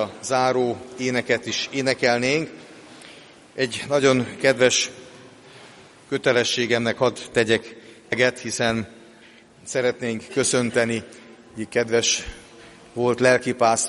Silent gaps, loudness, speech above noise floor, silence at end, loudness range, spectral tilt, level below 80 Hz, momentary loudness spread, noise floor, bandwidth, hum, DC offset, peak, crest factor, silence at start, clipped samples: none; -22 LUFS; 28 dB; 0 s; 3 LU; -3 dB/octave; -56 dBFS; 19 LU; -49 dBFS; 11.5 kHz; none; under 0.1%; -2 dBFS; 22 dB; 0 s; under 0.1%